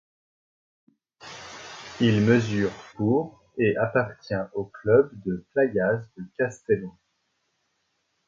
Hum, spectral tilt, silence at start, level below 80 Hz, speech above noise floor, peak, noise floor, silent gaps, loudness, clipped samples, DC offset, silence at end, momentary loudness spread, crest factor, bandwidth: none; -7 dB/octave; 1.25 s; -58 dBFS; 50 dB; -6 dBFS; -74 dBFS; none; -25 LUFS; under 0.1%; under 0.1%; 1.4 s; 19 LU; 20 dB; 7.6 kHz